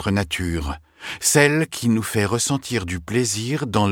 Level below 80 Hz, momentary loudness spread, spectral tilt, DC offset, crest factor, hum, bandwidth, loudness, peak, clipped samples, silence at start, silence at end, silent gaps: -40 dBFS; 11 LU; -4 dB/octave; under 0.1%; 20 dB; none; 19 kHz; -21 LUFS; 0 dBFS; under 0.1%; 0 s; 0 s; none